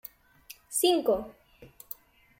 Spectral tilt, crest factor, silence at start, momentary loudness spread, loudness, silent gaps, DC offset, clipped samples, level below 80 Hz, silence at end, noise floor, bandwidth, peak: -2.5 dB/octave; 20 dB; 0.5 s; 24 LU; -27 LUFS; none; under 0.1%; under 0.1%; -62 dBFS; 0.75 s; -54 dBFS; 16.5 kHz; -12 dBFS